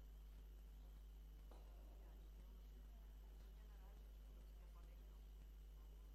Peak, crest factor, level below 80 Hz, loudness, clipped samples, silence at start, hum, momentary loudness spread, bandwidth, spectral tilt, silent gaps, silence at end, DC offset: -50 dBFS; 10 dB; -60 dBFS; -63 LUFS; under 0.1%; 0 s; 50 Hz at -60 dBFS; 0 LU; 13 kHz; -6 dB/octave; none; 0 s; under 0.1%